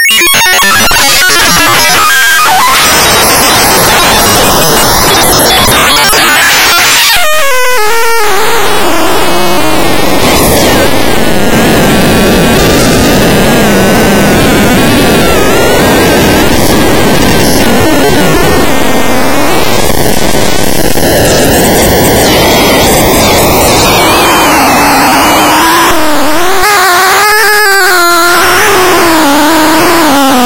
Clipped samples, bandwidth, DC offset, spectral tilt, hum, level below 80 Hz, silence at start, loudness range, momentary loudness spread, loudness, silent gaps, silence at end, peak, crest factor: 0.3%; over 20 kHz; 20%; -3 dB/octave; none; -22 dBFS; 0 s; 4 LU; 5 LU; -4 LUFS; none; 0 s; 0 dBFS; 6 dB